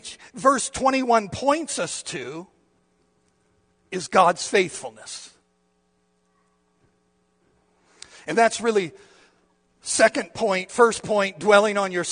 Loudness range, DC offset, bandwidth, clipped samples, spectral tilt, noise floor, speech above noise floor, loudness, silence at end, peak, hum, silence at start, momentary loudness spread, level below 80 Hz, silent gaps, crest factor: 8 LU; under 0.1%; 10 kHz; under 0.1%; -3 dB/octave; -68 dBFS; 46 dB; -21 LUFS; 0 s; -2 dBFS; none; 0.05 s; 18 LU; -62 dBFS; none; 24 dB